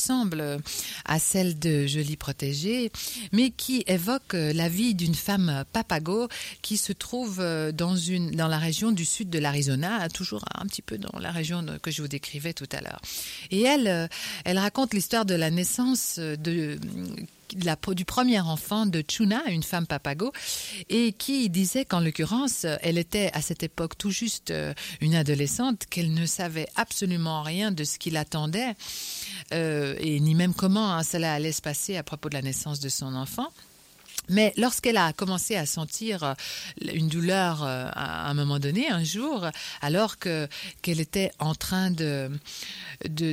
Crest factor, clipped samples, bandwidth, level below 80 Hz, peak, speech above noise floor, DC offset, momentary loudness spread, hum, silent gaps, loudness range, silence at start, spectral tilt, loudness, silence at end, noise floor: 18 dB; under 0.1%; 16.5 kHz; -56 dBFS; -10 dBFS; 23 dB; under 0.1%; 9 LU; none; none; 3 LU; 0 s; -4.5 dB/octave; -27 LUFS; 0 s; -51 dBFS